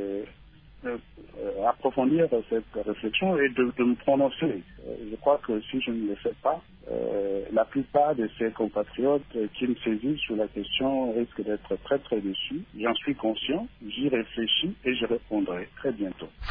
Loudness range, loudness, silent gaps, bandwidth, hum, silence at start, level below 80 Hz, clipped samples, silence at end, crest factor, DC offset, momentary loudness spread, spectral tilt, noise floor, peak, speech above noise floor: 3 LU; -28 LUFS; none; 4.9 kHz; none; 0 s; -54 dBFS; under 0.1%; 0 s; 18 dB; under 0.1%; 11 LU; -9 dB/octave; -51 dBFS; -10 dBFS; 24 dB